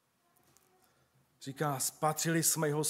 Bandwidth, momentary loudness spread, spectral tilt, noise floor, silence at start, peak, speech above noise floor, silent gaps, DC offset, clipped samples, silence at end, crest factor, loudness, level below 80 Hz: 16 kHz; 16 LU; -3.5 dB/octave; -71 dBFS; 1.4 s; -14 dBFS; 39 dB; none; under 0.1%; under 0.1%; 0 s; 22 dB; -31 LUFS; -82 dBFS